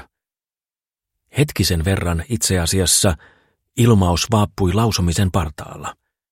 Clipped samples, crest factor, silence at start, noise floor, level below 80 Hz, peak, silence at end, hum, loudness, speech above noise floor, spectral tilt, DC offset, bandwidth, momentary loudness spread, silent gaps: under 0.1%; 18 dB; 1.35 s; under -90 dBFS; -34 dBFS; -2 dBFS; 0.4 s; none; -18 LUFS; over 73 dB; -4.5 dB/octave; under 0.1%; 16.5 kHz; 16 LU; none